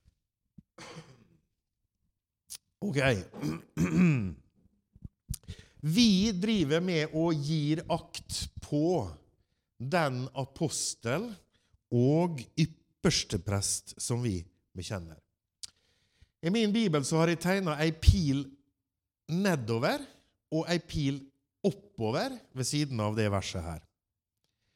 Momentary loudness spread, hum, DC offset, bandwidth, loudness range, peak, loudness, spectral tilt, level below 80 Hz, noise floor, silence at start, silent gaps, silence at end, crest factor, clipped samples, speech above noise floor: 18 LU; none; under 0.1%; 16.5 kHz; 5 LU; -8 dBFS; -30 LUFS; -5 dB/octave; -46 dBFS; -88 dBFS; 0.8 s; none; 0.95 s; 24 dB; under 0.1%; 59 dB